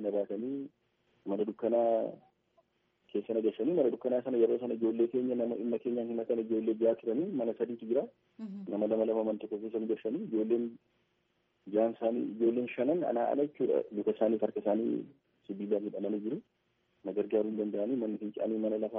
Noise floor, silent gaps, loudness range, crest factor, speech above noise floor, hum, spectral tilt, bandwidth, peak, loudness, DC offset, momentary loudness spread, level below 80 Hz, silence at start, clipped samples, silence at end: -77 dBFS; none; 4 LU; 18 dB; 44 dB; none; -7 dB/octave; 3.7 kHz; -16 dBFS; -33 LUFS; under 0.1%; 9 LU; -84 dBFS; 0 s; under 0.1%; 0 s